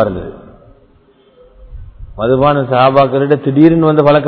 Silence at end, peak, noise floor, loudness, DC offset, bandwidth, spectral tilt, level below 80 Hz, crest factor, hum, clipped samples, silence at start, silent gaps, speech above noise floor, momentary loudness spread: 0 s; 0 dBFS; -48 dBFS; -11 LUFS; under 0.1%; 5.4 kHz; -10.5 dB/octave; -38 dBFS; 12 dB; none; 0.4%; 0 s; none; 38 dB; 11 LU